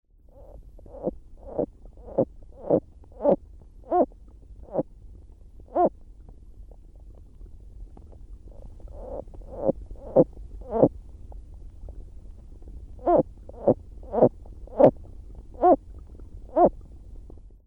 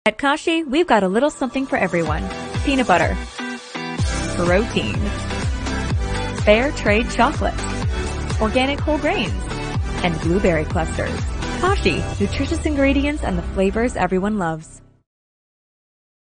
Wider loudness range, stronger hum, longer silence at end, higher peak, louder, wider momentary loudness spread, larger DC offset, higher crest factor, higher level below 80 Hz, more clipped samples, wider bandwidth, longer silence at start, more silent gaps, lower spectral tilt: first, 10 LU vs 2 LU; neither; second, 0.5 s vs 1.6 s; about the same, -2 dBFS vs 0 dBFS; second, -25 LUFS vs -20 LUFS; first, 26 LU vs 8 LU; neither; about the same, 24 dB vs 20 dB; second, -44 dBFS vs -28 dBFS; neither; second, 3.5 kHz vs 10 kHz; first, 0.55 s vs 0.05 s; neither; first, -11 dB/octave vs -5.5 dB/octave